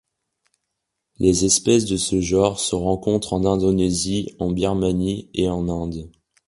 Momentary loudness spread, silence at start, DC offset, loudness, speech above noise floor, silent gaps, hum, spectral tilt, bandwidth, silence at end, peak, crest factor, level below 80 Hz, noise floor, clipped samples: 8 LU; 1.2 s; under 0.1%; -20 LUFS; 59 dB; none; none; -5 dB/octave; 11.5 kHz; 0.4 s; -2 dBFS; 20 dB; -40 dBFS; -79 dBFS; under 0.1%